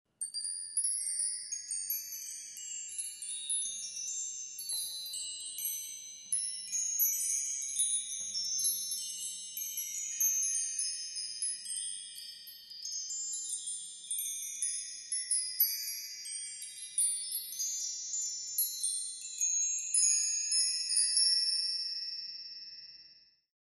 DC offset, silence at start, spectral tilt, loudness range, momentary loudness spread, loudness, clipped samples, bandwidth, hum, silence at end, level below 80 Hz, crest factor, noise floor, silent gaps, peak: under 0.1%; 0.2 s; 5 dB/octave; 8 LU; 12 LU; -32 LUFS; under 0.1%; 12.5 kHz; none; 0.45 s; -84 dBFS; 22 dB; -61 dBFS; none; -14 dBFS